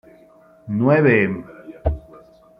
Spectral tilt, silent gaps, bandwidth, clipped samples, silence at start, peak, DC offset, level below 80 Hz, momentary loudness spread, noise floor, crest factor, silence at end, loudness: -10.5 dB/octave; none; 5.4 kHz; under 0.1%; 0.65 s; -2 dBFS; under 0.1%; -36 dBFS; 18 LU; -50 dBFS; 18 dB; 0.6 s; -19 LUFS